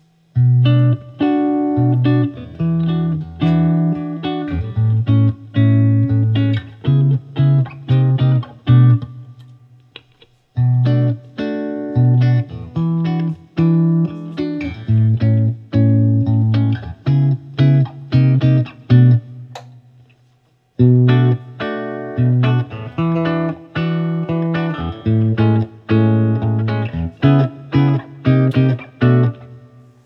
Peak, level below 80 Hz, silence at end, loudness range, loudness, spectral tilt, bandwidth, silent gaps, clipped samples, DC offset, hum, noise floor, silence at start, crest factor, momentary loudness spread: 0 dBFS; -46 dBFS; 0.45 s; 3 LU; -16 LUFS; -10.5 dB/octave; 5.6 kHz; none; under 0.1%; under 0.1%; none; -57 dBFS; 0.35 s; 14 dB; 9 LU